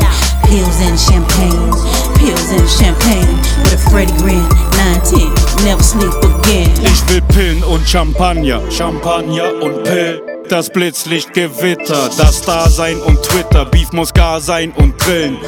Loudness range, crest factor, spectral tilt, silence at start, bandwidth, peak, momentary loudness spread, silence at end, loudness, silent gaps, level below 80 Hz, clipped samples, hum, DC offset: 4 LU; 10 dB; -4.5 dB/octave; 0 s; over 20 kHz; 0 dBFS; 5 LU; 0 s; -11 LUFS; none; -12 dBFS; 0.6%; none; 0.3%